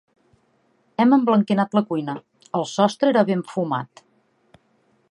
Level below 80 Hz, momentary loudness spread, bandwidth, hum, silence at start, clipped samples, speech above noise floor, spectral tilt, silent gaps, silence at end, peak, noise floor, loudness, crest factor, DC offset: -72 dBFS; 14 LU; 10.5 kHz; none; 1 s; under 0.1%; 44 dB; -6.5 dB/octave; none; 1.25 s; -2 dBFS; -64 dBFS; -21 LUFS; 20 dB; under 0.1%